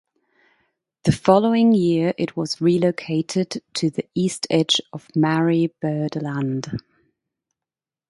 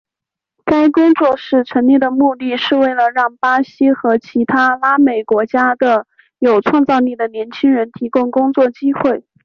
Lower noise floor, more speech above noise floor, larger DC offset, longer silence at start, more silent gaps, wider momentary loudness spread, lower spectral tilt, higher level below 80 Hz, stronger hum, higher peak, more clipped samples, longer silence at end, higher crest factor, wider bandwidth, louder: first, -90 dBFS vs -84 dBFS; about the same, 70 dB vs 71 dB; neither; first, 1.05 s vs 0.65 s; neither; first, 9 LU vs 6 LU; about the same, -5.5 dB/octave vs -6.5 dB/octave; about the same, -56 dBFS vs -56 dBFS; neither; about the same, 0 dBFS vs -2 dBFS; neither; first, 1.3 s vs 0.25 s; first, 20 dB vs 12 dB; first, 11.5 kHz vs 6.4 kHz; second, -21 LUFS vs -14 LUFS